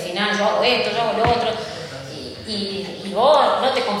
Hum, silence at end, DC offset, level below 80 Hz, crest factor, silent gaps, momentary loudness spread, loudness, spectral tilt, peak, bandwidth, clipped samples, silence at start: none; 0 s; under 0.1%; -48 dBFS; 16 dB; none; 16 LU; -19 LUFS; -4 dB/octave; -4 dBFS; 13 kHz; under 0.1%; 0 s